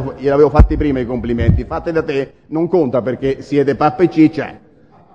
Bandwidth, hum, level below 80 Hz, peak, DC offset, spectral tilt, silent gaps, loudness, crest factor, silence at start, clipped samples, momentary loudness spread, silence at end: 7.6 kHz; none; -22 dBFS; 0 dBFS; 0.2%; -9 dB/octave; none; -15 LUFS; 14 dB; 0 s; under 0.1%; 9 LU; 0.55 s